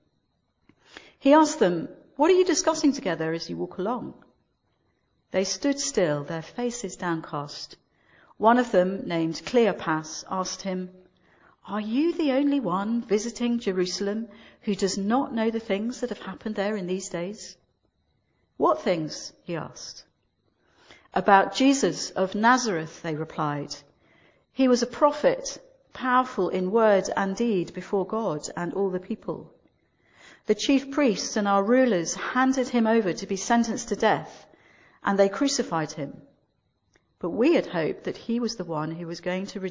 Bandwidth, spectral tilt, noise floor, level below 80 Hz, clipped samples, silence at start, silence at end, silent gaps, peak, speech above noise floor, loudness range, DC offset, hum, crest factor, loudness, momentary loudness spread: 7.6 kHz; -4.5 dB/octave; -73 dBFS; -62 dBFS; under 0.1%; 0.95 s; 0 s; none; -2 dBFS; 48 dB; 6 LU; under 0.1%; none; 24 dB; -25 LUFS; 13 LU